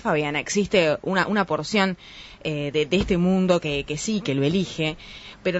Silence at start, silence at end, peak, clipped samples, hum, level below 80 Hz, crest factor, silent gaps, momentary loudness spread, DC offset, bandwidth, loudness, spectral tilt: 0 s; 0 s; -6 dBFS; under 0.1%; none; -46 dBFS; 18 dB; none; 9 LU; under 0.1%; 8 kHz; -23 LUFS; -5 dB/octave